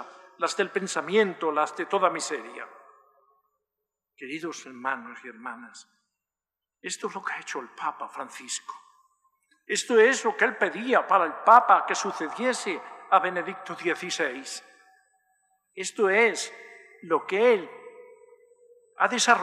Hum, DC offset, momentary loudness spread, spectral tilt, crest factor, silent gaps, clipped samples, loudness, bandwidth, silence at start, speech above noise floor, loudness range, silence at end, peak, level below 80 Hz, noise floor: none; under 0.1%; 20 LU; -2.5 dB/octave; 24 dB; none; under 0.1%; -25 LUFS; 13 kHz; 0 s; over 64 dB; 15 LU; 0 s; -4 dBFS; -90 dBFS; under -90 dBFS